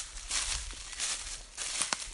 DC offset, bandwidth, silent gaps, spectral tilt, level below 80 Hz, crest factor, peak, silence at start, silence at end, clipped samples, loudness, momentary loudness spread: under 0.1%; 11.5 kHz; none; 0.5 dB/octave; -48 dBFS; 30 dB; -8 dBFS; 0 s; 0 s; under 0.1%; -34 LUFS; 7 LU